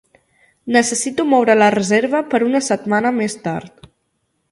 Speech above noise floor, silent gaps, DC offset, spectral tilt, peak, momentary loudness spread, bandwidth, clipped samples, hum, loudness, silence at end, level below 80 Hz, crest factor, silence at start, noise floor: 53 dB; none; under 0.1%; -4 dB/octave; 0 dBFS; 11 LU; 11.5 kHz; under 0.1%; none; -16 LUFS; 0.85 s; -60 dBFS; 18 dB; 0.65 s; -69 dBFS